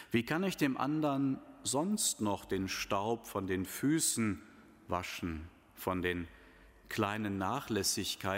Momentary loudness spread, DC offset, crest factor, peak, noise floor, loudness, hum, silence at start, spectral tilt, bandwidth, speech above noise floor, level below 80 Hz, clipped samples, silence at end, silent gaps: 9 LU; under 0.1%; 20 dB; -16 dBFS; -59 dBFS; -35 LUFS; none; 0 s; -4 dB/octave; 16 kHz; 24 dB; -60 dBFS; under 0.1%; 0 s; none